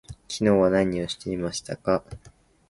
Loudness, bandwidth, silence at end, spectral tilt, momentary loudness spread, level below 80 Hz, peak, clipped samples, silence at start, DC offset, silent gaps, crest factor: -25 LUFS; 11.5 kHz; 0.4 s; -5.5 dB/octave; 15 LU; -50 dBFS; -8 dBFS; under 0.1%; 0.1 s; under 0.1%; none; 18 dB